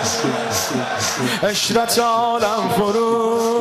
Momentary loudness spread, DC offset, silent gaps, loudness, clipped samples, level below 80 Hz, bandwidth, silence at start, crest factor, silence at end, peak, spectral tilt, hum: 4 LU; under 0.1%; none; -18 LUFS; under 0.1%; -54 dBFS; 15.5 kHz; 0 s; 10 dB; 0 s; -8 dBFS; -3 dB/octave; none